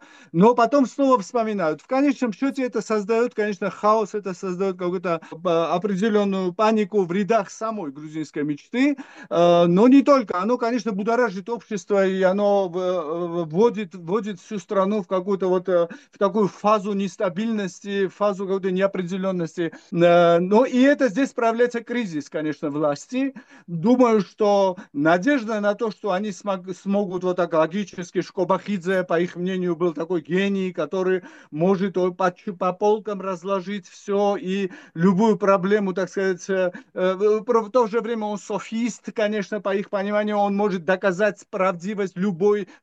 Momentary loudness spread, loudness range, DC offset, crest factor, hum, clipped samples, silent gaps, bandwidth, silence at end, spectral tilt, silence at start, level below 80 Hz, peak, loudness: 10 LU; 4 LU; under 0.1%; 18 dB; none; under 0.1%; none; 8.4 kHz; 0.2 s; -6.5 dB/octave; 0.35 s; -72 dBFS; -4 dBFS; -22 LUFS